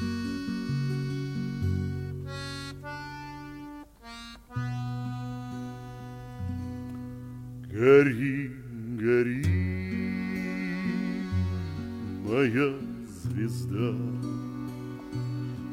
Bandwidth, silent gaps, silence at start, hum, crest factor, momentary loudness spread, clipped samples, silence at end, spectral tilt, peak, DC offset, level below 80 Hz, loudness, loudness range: 16 kHz; none; 0 s; none; 22 dB; 16 LU; under 0.1%; 0 s; -7.5 dB/octave; -8 dBFS; under 0.1%; -52 dBFS; -30 LUFS; 11 LU